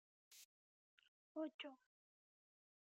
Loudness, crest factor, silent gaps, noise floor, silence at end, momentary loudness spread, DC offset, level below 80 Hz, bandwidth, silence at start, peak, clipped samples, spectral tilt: -53 LUFS; 22 dB; 0.45-0.98 s, 1.08-1.35 s, 1.54-1.59 s; under -90 dBFS; 1.2 s; 17 LU; under 0.1%; under -90 dBFS; 8 kHz; 0.3 s; -36 dBFS; under 0.1%; 0 dB/octave